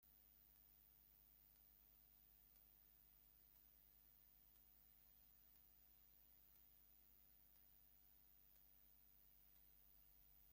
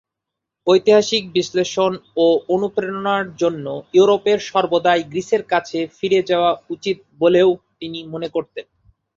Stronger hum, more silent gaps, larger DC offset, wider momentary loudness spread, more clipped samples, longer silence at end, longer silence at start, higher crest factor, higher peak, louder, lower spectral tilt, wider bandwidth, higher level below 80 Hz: neither; neither; neither; second, 1 LU vs 12 LU; neither; second, 0 s vs 0.55 s; second, 0 s vs 0.65 s; about the same, 16 dB vs 16 dB; second, -56 dBFS vs -2 dBFS; second, -69 LUFS vs -18 LUFS; second, -3 dB/octave vs -5 dB/octave; first, 16.5 kHz vs 7.6 kHz; second, -82 dBFS vs -62 dBFS